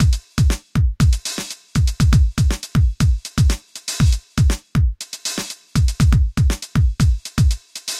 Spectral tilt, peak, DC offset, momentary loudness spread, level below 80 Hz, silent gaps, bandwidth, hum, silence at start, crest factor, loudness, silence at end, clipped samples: -5 dB/octave; -2 dBFS; under 0.1%; 8 LU; -20 dBFS; none; 15.5 kHz; none; 0 s; 14 dB; -19 LUFS; 0 s; under 0.1%